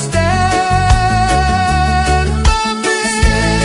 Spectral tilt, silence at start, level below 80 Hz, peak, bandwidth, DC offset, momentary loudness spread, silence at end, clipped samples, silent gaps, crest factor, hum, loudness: -4.5 dB/octave; 0 s; -18 dBFS; 0 dBFS; 11 kHz; under 0.1%; 2 LU; 0 s; under 0.1%; none; 12 dB; none; -13 LUFS